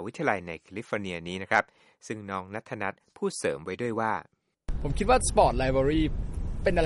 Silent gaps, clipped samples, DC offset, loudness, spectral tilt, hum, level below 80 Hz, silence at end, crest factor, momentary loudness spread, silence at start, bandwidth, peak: none; under 0.1%; under 0.1%; -29 LUFS; -5 dB/octave; none; -36 dBFS; 0 s; 20 dB; 15 LU; 0 s; 11.5 kHz; -8 dBFS